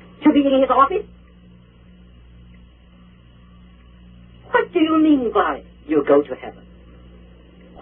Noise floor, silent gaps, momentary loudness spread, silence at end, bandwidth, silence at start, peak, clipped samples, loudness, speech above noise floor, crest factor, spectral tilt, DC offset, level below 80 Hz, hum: -47 dBFS; none; 16 LU; 1.3 s; 3.7 kHz; 0.2 s; -2 dBFS; under 0.1%; -18 LUFS; 30 dB; 20 dB; -10.5 dB/octave; under 0.1%; -48 dBFS; 60 Hz at -50 dBFS